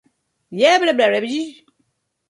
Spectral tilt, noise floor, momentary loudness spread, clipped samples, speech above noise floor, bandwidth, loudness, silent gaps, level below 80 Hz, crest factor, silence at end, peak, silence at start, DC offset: -3.5 dB/octave; -69 dBFS; 17 LU; under 0.1%; 52 dB; 11.5 kHz; -17 LUFS; none; -72 dBFS; 18 dB; 0.75 s; -2 dBFS; 0.5 s; under 0.1%